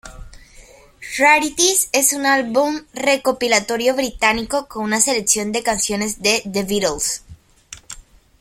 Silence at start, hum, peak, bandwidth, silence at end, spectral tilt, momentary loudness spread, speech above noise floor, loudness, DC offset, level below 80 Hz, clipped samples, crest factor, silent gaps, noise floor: 0.05 s; none; 0 dBFS; 16.5 kHz; 0.4 s; -1.5 dB/octave; 11 LU; 27 dB; -17 LUFS; under 0.1%; -46 dBFS; under 0.1%; 18 dB; none; -45 dBFS